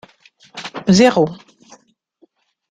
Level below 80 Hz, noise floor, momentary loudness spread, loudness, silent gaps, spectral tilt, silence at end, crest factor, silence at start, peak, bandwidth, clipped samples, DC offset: -54 dBFS; -57 dBFS; 20 LU; -14 LUFS; none; -5.5 dB/octave; 1.35 s; 18 dB; 0.55 s; 0 dBFS; 9.6 kHz; under 0.1%; under 0.1%